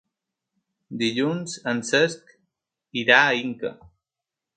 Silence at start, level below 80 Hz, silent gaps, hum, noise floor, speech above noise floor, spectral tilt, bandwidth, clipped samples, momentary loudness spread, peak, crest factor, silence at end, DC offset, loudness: 0.9 s; -68 dBFS; none; none; -88 dBFS; 65 dB; -3.5 dB/octave; 9.4 kHz; under 0.1%; 17 LU; 0 dBFS; 26 dB; 0.85 s; under 0.1%; -22 LUFS